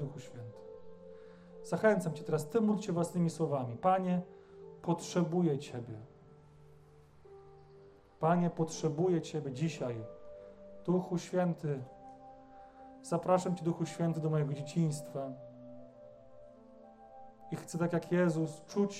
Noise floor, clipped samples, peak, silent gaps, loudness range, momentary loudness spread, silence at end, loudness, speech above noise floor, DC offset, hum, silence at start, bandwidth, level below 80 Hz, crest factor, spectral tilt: -59 dBFS; under 0.1%; -16 dBFS; none; 6 LU; 23 LU; 0 s; -34 LUFS; 26 dB; under 0.1%; none; 0 s; 13.5 kHz; -72 dBFS; 20 dB; -7 dB/octave